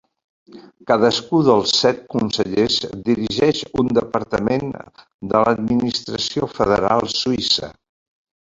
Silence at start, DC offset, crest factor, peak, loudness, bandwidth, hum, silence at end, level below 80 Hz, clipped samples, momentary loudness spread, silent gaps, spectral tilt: 0.55 s; under 0.1%; 18 dB; 0 dBFS; -18 LUFS; 7.8 kHz; none; 0.8 s; -48 dBFS; under 0.1%; 7 LU; 5.14-5.19 s; -4.5 dB/octave